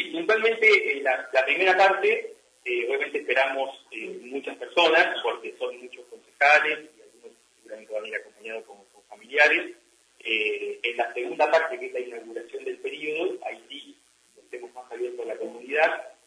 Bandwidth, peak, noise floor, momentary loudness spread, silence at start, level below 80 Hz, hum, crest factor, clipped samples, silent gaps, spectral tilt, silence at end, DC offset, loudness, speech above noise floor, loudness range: 11 kHz; -6 dBFS; -59 dBFS; 20 LU; 0 s; -86 dBFS; none; 20 dB; under 0.1%; none; -2 dB/octave; 0.2 s; under 0.1%; -24 LUFS; 34 dB; 8 LU